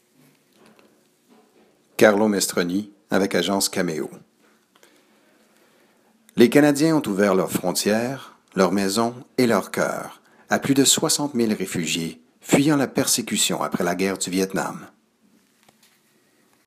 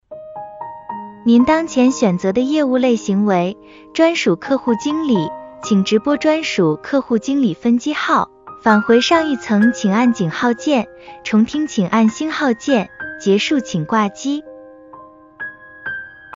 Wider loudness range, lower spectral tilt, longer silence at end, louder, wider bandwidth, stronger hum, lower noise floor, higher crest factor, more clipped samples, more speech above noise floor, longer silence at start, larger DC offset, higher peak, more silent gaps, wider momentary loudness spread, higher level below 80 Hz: about the same, 5 LU vs 3 LU; second, -4 dB/octave vs -5.5 dB/octave; first, 1.8 s vs 0 s; second, -21 LUFS vs -16 LUFS; first, 15.5 kHz vs 7.6 kHz; neither; first, -61 dBFS vs -41 dBFS; first, 22 dB vs 16 dB; neither; first, 41 dB vs 25 dB; first, 2 s vs 0.1 s; neither; about the same, 0 dBFS vs 0 dBFS; neither; about the same, 14 LU vs 15 LU; second, -66 dBFS vs -54 dBFS